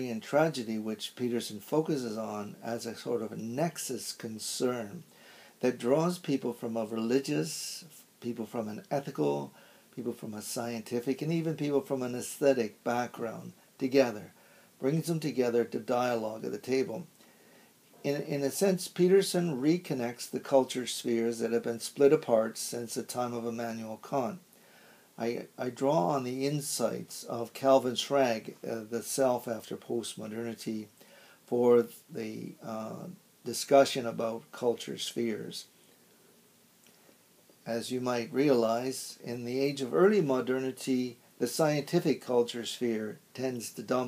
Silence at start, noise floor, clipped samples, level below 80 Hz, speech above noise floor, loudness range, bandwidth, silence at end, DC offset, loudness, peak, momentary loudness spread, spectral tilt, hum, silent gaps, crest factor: 0 s; -63 dBFS; under 0.1%; -84 dBFS; 32 dB; 6 LU; 15.5 kHz; 0 s; under 0.1%; -31 LUFS; -10 dBFS; 13 LU; -5 dB/octave; none; none; 22 dB